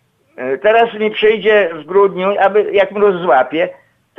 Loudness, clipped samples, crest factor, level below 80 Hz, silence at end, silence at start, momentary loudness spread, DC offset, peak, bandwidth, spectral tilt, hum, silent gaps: -13 LUFS; under 0.1%; 12 dB; -56 dBFS; 0.45 s; 0.4 s; 6 LU; under 0.1%; -2 dBFS; 4 kHz; -7 dB/octave; none; none